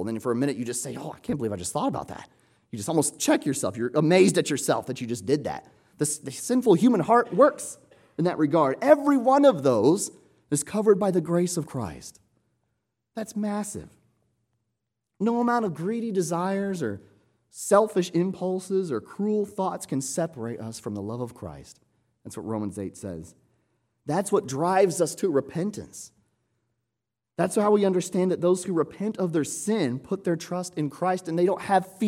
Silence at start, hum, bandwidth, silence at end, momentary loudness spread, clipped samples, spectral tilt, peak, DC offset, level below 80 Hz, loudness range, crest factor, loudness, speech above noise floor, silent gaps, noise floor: 0 s; none; 16.5 kHz; 0 s; 16 LU; under 0.1%; -5.5 dB/octave; -4 dBFS; under 0.1%; -64 dBFS; 11 LU; 22 dB; -25 LUFS; 60 dB; none; -85 dBFS